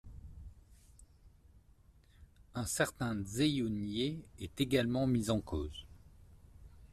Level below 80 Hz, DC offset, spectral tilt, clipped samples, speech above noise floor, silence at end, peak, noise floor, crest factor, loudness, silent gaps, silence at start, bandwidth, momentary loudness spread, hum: -56 dBFS; under 0.1%; -5 dB/octave; under 0.1%; 29 dB; 0.05 s; -18 dBFS; -64 dBFS; 20 dB; -35 LUFS; none; 0.05 s; 14 kHz; 21 LU; none